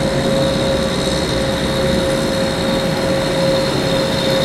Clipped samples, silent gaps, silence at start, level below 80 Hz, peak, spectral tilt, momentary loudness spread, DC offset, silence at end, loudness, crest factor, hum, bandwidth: under 0.1%; none; 0 s; -32 dBFS; -4 dBFS; -5 dB/octave; 2 LU; under 0.1%; 0 s; -17 LUFS; 12 dB; none; 16 kHz